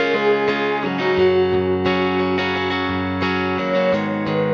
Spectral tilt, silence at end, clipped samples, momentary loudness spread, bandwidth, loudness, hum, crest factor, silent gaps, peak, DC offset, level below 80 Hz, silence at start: -7 dB/octave; 0 s; under 0.1%; 4 LU; 6.8 kHz; -19 LUFS; none; 12 dB; none; -6 dBFS; under 0.1%; -54 dBFS; 0 s